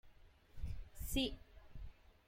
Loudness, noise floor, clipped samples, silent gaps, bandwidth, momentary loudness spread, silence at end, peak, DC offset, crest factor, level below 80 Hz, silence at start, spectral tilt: -44 LUFS; -63 dBFS; under 0.1%; none; 16.5 kHz; 21 LU; 0.15 s; -24 dBFS; under 0.1%; 22 dB; -50 dBFS; 0.05 s; -4 dB/octave